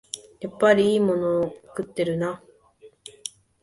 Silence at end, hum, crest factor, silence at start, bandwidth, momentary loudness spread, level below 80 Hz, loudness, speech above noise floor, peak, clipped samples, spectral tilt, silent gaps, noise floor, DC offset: 0.35 s; none; 20 dB; 0.15 s; 11.5 kHz; 19 LU; -62 dBFS; -23 LUFS; 31 dB; -4 dBFS; under 0.1%; -5.5 dB/octave; none; -53 dBFS; under 0.1%